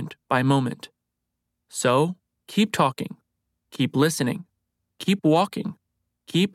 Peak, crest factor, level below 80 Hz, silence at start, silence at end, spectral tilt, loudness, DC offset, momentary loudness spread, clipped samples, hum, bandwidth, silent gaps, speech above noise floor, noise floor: -6 dBFS; 20 dB; -70 dBFS; 0 s; 0.05 s; -5.5 dB/octave; -23 LUFS; under 0.1%; 15 LU; under 0.1%; none; 16 kHz; none; 59 dB; -81 dBFS